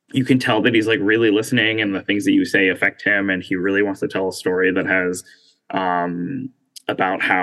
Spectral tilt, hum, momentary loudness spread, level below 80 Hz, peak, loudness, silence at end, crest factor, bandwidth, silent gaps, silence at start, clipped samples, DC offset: -5 dB/octave; none; 11 LU; -70 dBFS; -2 dBFS; -18 LUFS; 0 s; 16 dB; 12.5 kHz; none; 0.15 s; under 0.1%; under 0.1%